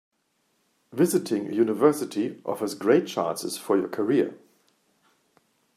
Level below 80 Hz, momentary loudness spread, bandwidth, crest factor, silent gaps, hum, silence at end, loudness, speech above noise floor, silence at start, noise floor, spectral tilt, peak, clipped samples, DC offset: -76 dBFS; 8 LU; 15 kHz; 22 dB; none; none; 1.4 s; -25 LUFS; 47 dB; 0.95 s; -72 dBFS; -5.5 dB/octave; -6 dBFS; under 0.1%; under 0.1%